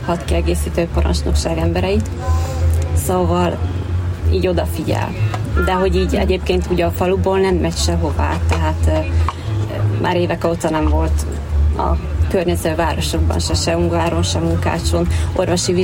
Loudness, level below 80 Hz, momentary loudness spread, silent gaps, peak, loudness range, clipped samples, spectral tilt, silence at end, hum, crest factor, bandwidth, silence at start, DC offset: -18 LUFS; -22 dBFS; 3 LU; none; -4 dBFS; 1 LU; under 0.1%; -6 dB/octave; 0 s; none; 12 dB; 16.5 kHz; 0 s; under 0.1%